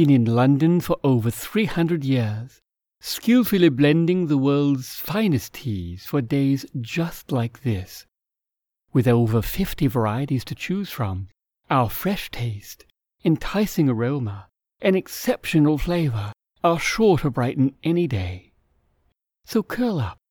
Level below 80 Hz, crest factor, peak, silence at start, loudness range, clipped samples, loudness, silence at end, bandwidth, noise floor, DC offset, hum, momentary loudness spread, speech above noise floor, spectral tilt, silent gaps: -44 dBFS; 16 dB; -6 dBFS; 0 s; 5 LU; under 0.1%; -22 LUFS; 0.15 s; over 20 kHz; -87 dBFS; under 0.1%; none; 12 LU; 66 dB; -6.5 dB/octave; none